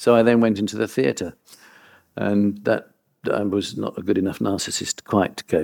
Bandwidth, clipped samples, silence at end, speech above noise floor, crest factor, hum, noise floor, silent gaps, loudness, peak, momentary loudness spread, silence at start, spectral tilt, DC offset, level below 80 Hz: 18 kHz; under 0.1%; 0 s; 31 dB; 18 dB; none; -52 dBFS; none; -22 LUFS; -4 dBFS; 10 LU; 0 s; -5 dB/octave; under 0.1%; -60 dBFS